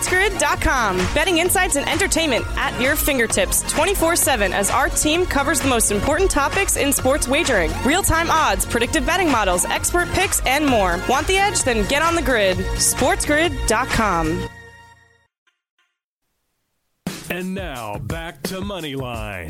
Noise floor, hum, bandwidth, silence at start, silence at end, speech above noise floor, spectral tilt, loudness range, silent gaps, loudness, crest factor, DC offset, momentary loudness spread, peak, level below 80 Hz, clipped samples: -75 dBFS; none; 16.5 kHz; 0 s; 0 s; 56 dB; -3 dB/octave; 12 LU; 15.38-15.46 s, 15.70-15.77 s, 16.04-16.21 s; -18 LUFS; 14 dB; under 0.1%; 11 LU; -6 dBFS; -32 dBFS; under 0.1%